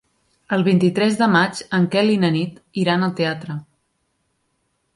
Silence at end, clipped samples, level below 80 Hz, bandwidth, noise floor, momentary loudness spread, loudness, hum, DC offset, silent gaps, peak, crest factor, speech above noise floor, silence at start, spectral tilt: 1.35 s; under 0.1%; -62 dBFS; 11.5 kHz; -70 dBFS; 10 LU; -19 LUFS; none; under 0.1%; none; -2 dBFS; 18 dB; 51 dB; 0.5 s; -6.5 dB/octave